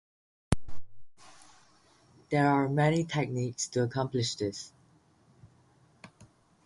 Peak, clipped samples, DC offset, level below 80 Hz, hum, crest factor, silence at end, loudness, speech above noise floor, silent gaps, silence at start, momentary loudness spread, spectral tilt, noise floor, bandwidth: -8 dBFS; under 0.1%; under 0.1%; -52 dBFS; none; 24 dB; 0.4 s; -30 LUFS; 35 dB; none; 0.5 s; 9 LU; -5.5 dB/octave; -64 dBFS; 11.5 kHz